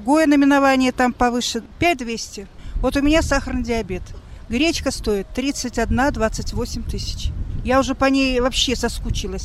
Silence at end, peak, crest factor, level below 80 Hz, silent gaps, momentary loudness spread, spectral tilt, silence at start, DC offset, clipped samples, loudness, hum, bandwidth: 0 s; -4 dBFS; 14 dB; -30 dBFS; none; 13 LU; -4.5 dB/octave; 0 s; under 0.1%; under 0.1%; -20 LUFS; none; 14.5 kHz